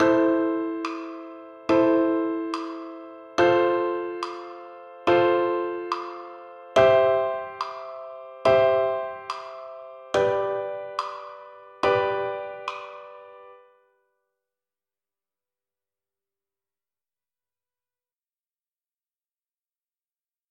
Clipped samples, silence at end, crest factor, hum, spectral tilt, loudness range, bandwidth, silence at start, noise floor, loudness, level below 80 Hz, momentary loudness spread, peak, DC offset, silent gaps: under 0.1%; 6.95 s; 22 dB; none; -6 dB/octave; 7 LU; 9.4 kHz; 0 s; under -90 dBFS; -24 LUFS; -64 dBFS; 21 LU; -4 dBFS; under 0.1%; none